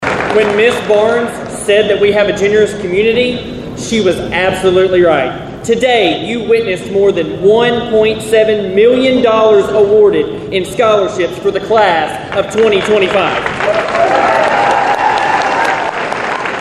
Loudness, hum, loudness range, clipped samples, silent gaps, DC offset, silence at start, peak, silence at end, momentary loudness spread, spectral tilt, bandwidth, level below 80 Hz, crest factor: -11 LUFS; none; 2 LU; under 0.1%; none; under 0.1%; 0 s; 0 dBFS; 0 s; 7 LU; -4.5 dB/octave; 12.5 kHz; -40 dBFS; 10 dB